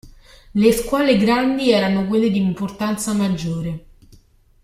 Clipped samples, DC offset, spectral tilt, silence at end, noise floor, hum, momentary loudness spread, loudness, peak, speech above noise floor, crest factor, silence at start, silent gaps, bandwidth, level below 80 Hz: under 0.1%; under 0.1%; -5.5 dB/octave; 0.85 s; -51 dBFS; none; 10 LU; -19 LUFS; -2 dBFS; 33 dB; 18 dB; 0.05 s; none; 15.5 kHz; -44 dBFS